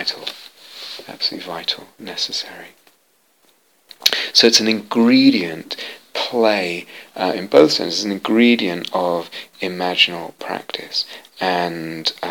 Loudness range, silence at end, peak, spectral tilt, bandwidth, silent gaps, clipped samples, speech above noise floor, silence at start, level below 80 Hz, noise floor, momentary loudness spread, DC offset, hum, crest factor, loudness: 10 LU; 0 s; 0 dBFS; -3 dB/octave; 18.5 kHz; none; under 0.1%; 42 dB; 0 s; -68 dBFS; -60 dBFS; 18 LU; under 0.1%; none; 20 dB; -18 LUFS